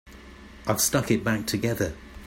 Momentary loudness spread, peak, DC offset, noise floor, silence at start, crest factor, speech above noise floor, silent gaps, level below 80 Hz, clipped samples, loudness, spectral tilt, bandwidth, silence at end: 10 LU; -8 dBFS; under 0.1%; -46 dBFS; 0.05 s; 20 dB; 21 dB; none; -48 dBFS; under 0.1%; -26 LUFS; -4 dB/octave; 16.5 kHz; 0 s